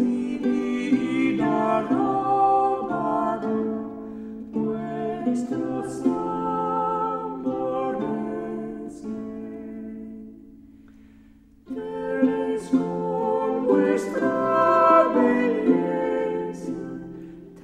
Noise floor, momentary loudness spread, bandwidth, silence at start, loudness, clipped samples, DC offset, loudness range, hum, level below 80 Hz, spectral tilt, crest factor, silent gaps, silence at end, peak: -52 dBFS; 16 LU; 10.5 kHz; 0 s; -24 LUFS; under 0.1%; under 0.1%; 11 LU; none; -58 dBFS; -7 dB/octave; 20 dB; none; 0 s; -4 dBFS